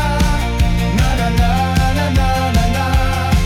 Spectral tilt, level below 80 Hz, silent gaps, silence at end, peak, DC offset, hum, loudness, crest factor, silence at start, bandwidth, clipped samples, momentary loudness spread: -5.5 dB/octave; -18 dBFS; none; 0 s; -4 dBFS; under 0.1%; none; -16 LUFS; 10 dB; 0 s; 16.5 kHz; under 0.1%; 1 LU